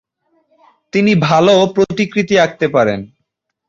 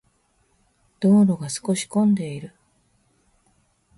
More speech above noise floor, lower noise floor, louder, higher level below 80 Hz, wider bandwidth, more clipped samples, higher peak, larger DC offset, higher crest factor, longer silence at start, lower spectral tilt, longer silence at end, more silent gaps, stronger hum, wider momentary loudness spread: first, 59 dB vs 45 dB; first, -72 dBFS vs -65 dBFS; first, -13 LUFS vs -21 LUFS; first, -52 dBFS vs -64 dBFS; second, 7.6 kHz vs 11.5 kHz; neither; first, -2 dBFS vs -8 dBFS; neither; about the same, 14 dB vs 16 dB; about the same, 0.95 s vs 1 s; about the same, -6 dB/octave vs -6.5 dB/octave; second, 0.65 s vs 1.5 s; neither; neither; second, 7 LU vs 17 LU